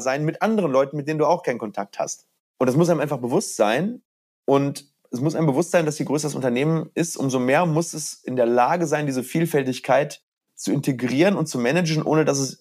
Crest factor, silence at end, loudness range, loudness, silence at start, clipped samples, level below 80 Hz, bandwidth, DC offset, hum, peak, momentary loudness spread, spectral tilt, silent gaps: 16 dB; 0.05 s; 1 LU; -22 LUFS; 0 s; under 0.1%; -72 dBFS; 15.5 kHz; under 0.1%; none; -4 dBFS; 10 LU; -5.5 dB/octave; 2.40-2.54 s, 4.05-4.43 s, 10.23-10.37 s